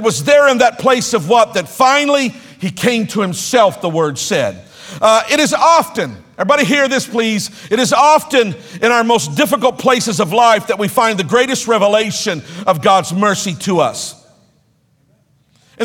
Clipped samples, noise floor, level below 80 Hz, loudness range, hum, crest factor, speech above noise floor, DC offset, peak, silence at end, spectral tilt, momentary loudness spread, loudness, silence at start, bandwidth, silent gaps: under 0.1%; -57 dBFS; -56 dBFS; 3 LU; none; 14 dB; 43 dB; under 0.1%; 0 dBFS; 0 s; -3.5 dB/octave; 10 LU; -13 LUFS; 0 s; 18.5 kHz; none